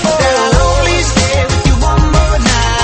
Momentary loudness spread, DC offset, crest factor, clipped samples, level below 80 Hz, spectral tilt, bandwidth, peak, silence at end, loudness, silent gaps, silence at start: 1 LU; under 0.1%; 10 dB; under 0.1%; -14 dBFS; -4.5 dB/octave; 8.8 kHz; 0 dBFS; 0 s; -11 LUFS; none; 0 s